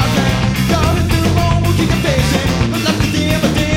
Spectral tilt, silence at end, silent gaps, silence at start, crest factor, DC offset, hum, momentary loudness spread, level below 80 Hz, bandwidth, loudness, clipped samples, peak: -5.5 dB/octave; 0 s; none; 0 s; 12 dB; under 0.1%; none; 1 LU; -24 dBFS; 19 kHz; -14 LUFS; under 0.1%; 0 dBFS